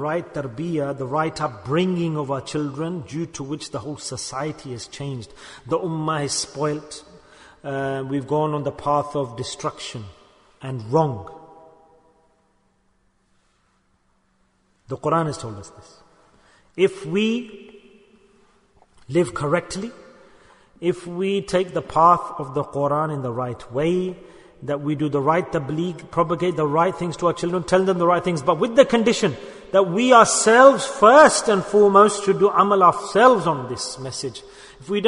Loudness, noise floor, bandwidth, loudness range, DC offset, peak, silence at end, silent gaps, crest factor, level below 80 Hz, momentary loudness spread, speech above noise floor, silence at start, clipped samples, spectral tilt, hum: -20 LUFS; -64 dBFS; 11 kHz; 15 LU; under 0.1%; 0 dBFS; 0 s; none; 22 dB; -56 dBFS; 18 LU; 44 dB; 0 s; under 0.1%; -5 dB/octave; none